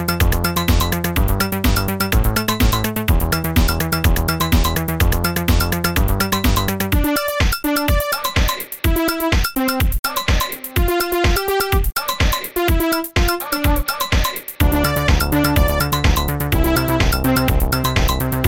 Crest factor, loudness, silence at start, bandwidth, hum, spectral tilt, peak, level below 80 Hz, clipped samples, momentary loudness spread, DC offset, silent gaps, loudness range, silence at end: 14 dB; -18 LUFS; 0 s; 19 kHz; none; -4.5 dB/octave; -2 dBFS; -22 dBFS; under 0.1%; 3 LU; 0.6%; 9.99-10.03 s; 2 LU; 0 s